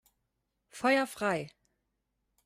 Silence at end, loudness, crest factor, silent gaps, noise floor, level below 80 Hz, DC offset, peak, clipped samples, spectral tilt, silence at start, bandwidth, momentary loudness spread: 0.95 s; -30 LUFS; 20 dB; none; -82 dBFS; -74 dBFS; under 0.1%; -16 dBFS; under 0.1%; -4.5 dB/octave; 0.75 s; 16 kHz; 20 LU